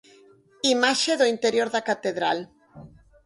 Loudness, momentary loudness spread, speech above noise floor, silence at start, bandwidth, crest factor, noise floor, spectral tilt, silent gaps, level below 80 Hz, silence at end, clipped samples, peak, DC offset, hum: -23 LUFS; 7 LU; 32 dB; 0.65 s; 11.5 kHz; 20 dB; -55 dBFS; -2 dB/octave; none; -66 dBFS; 0.4 s; under 0.1%; -6 dBFS; under 0.1%; none